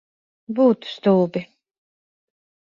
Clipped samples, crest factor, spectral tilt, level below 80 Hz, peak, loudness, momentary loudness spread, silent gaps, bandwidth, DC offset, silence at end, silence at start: under 0.1%; 18 dB; -8.5 dB/octave; -68 dBFS; -4 dBFS; -20 LUFS; 11 LU; none; 7.2 kHz; under 0.1%; 1.35 s; 0.5 s